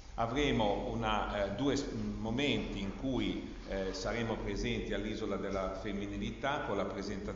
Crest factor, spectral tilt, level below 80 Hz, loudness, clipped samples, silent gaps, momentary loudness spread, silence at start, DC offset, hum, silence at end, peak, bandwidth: 18 dB; -4.5 dB/octave; -46 dBFS; -36 LUFS; under 0.1%; none; 6 LU; 0 s; under 0.1%; none; 0 s; -18 dBFS; 7.6 kHz